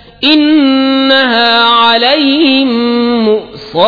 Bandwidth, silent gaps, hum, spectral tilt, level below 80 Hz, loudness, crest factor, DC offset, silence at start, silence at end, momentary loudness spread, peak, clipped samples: 5.4 kHz; none; none; -5.5 dB/octave; -48 dBFS; -8 LUFS; 8 dB; under 0.1%; 0.2 s; 0 s; 5 LU; 0 dBFS; 0.3%